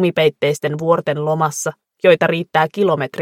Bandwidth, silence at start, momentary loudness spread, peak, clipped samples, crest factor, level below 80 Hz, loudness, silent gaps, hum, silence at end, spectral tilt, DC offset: 16 kHz; 0 s; 6 LU; 0 dBFS; under 0.1%; 16 dB; -64 dBFS; -17 LUFS; none; none; 0 s; -5 dB/octave; under 0.1%